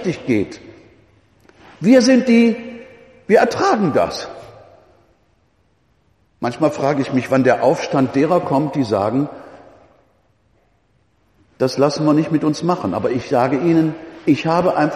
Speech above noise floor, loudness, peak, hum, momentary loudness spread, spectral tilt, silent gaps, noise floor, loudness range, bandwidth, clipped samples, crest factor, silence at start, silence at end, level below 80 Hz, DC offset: 44 dB; -17 LUFS; 0 dBFS; none; 13 LU; -6.5 dB/octave; none; -60 dBFS; 7 LU; 13 kHz; under 0.1%; 18 dB; 0 s; 0 s; -56 dBFS; under 0.1%